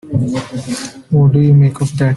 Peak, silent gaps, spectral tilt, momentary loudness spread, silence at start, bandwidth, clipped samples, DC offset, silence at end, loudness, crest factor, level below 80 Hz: -2 dBFS; none; -7.5 dB/octave; 13 LU; 0.05 s; 11.5 kHz; under 0.1%; under 0.1%; 0 s; -13 LUFS; 10 dB; -44 dBFS